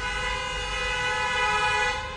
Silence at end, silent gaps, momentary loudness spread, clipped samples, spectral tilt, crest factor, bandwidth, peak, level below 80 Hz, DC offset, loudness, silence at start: 0 s; none; 6 LU; under 0.1%; -2 dB/octave; 14 dB; 11.5 kHz; -12 dBFS; -40 dBFS; under 0.1%; -25 LUFS; 0 s